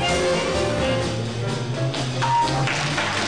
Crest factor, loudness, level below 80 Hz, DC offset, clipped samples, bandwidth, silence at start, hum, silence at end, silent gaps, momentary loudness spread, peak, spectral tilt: 10 dB; -22 LUFS; -42 dBFS; 0.6%; under 0.1%; 10.5 kHz; 0 s; none; 0 s; none; 6 LU; -14 dBFS; -4.5 dB/octave